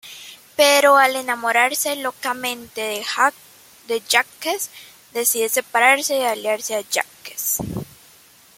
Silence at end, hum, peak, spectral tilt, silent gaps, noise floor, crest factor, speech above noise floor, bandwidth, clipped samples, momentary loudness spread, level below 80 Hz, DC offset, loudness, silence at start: 0.75 s; none; -2 dBFS; -1.5 dB/octave; none; -50 dBFS; 18 dB; 31 dB; 16.5 kHz; under 0.1%; 15 LU; -58 dBFS; under 0.1%; -19 LUFS; 0.05 s